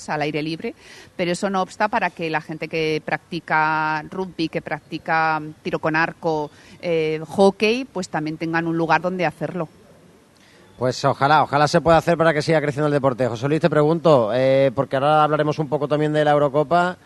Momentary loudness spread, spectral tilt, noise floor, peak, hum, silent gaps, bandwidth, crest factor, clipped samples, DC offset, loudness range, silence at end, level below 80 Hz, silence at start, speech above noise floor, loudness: 10 LU; -6 dB/octave; -51 dBFS; -2 dBFS; none; none; 12 kHz; 18 dB; under 0.1%; under 0.1%; 6 LU; 0.1 s; -54 dBFS; 0 s; 31 dB; -20 LUFS